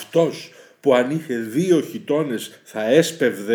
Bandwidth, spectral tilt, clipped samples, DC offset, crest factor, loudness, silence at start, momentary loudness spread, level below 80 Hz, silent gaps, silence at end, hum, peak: over 20 kHz; -5.5 dB/octave; under 0.1%; under 0.1%; 18 dB; -20 LUFS; 0 s; 12 LU; -80 dBFS; none; 0 s; none; -2 dBFS